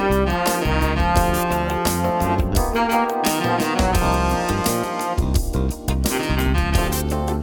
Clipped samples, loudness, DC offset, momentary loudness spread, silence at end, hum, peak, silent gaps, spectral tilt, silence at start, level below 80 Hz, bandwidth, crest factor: under 0.1%; -20 LUFS; under 0.1%; 4 LU; 0 s; none; -2 dBFS; none; -5 dB/octave; 0 s; -26 dBFS; 19 kHz; 18 dB